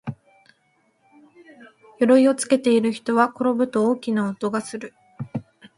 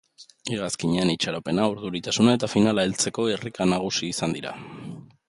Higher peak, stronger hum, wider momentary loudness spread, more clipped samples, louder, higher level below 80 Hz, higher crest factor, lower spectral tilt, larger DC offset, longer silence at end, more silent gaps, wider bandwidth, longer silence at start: about the same, -4 dBFS vs -4 dBFS; neither; about the same, 18 LU vs 16 LU; neither; first, -20 LUFS vs -24 LUFS; second, -68 dBFS vs -56 dBFS; about the same, 20 dB vs 20 dB; about the same, -5.5 dB/octave vs -4.5 dB/octave; neither; about the same, 0.35 s vs 0.25 s; neither; about the same, 11.5 kHz vs 11.5 kHz; second, 0.05 s vs 0.2 s